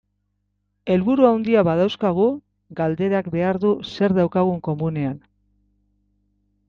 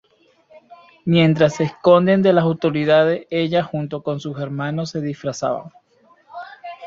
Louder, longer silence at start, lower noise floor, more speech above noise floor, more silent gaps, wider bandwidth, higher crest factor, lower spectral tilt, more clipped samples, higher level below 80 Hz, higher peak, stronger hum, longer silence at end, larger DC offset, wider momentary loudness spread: about the same, -20 LUFS vs -18 LUFS; first, 0.85 s vs 0.55 s; first, -72 dBFS vs -55 dBFS; first, 52 dB vs 38 dB; neither; second, 6.8 kHz vs 7.6 kHz; about the same, 18 dB vs 18 dB; first, -8.5 dB/octave vs -7 dB/octave; neither; about the same, -56 dBFS vs -60 dBFS; about the same, -4 dBFS vs -2 dBFS; first, 50 Hz at -50 dBFS vs none; first, 1.5 s vs 0 s; neither; second, 11 LU vs 15 LU